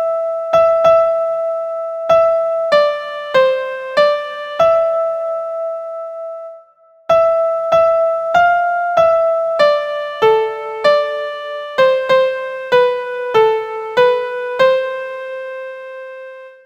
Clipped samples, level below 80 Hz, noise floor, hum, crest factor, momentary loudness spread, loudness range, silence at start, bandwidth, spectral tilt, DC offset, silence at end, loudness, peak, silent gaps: under 0.1%; -56 dBFS; -48 dBFS; none; 14 dB; 14 LU; 4 LU; 0 s; 8.4 kHz; -3.5 dB/octave; under 0.1%; 0.15 s; -15 LUFS; 0 dBFS; none